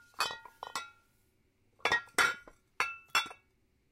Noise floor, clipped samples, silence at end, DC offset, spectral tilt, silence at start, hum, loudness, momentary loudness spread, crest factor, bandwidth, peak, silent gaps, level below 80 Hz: -72 dBFS; under 0.1%; 0.6 s; under 0.1%; 0 dB/octave; 0.2 s; none; -33 LUFS; 15 LU; 24 dB; 16 kHz; -14 dBFS; none; -72 dBFS